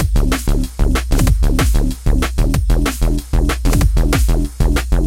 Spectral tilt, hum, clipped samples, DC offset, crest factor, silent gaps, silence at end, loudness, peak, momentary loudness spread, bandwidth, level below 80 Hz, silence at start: -5.5 dB/octave; none; under 0.1%; under 0.1%; 12 dB; none; 0 s; -17 LUFS; -2 dBFS; 3 LU; 16.5 kHz; -14 dBFS; 0 s